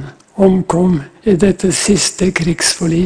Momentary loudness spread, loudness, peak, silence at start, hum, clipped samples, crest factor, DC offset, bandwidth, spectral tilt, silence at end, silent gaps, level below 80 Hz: 4 LU; -13 LUFS; 0 dBFS; 0 s; none; under 0.1%; 14 dB; under 0.1%; 11 kHz; -4.5 dB/octave; 0 s; none; -36 dBFS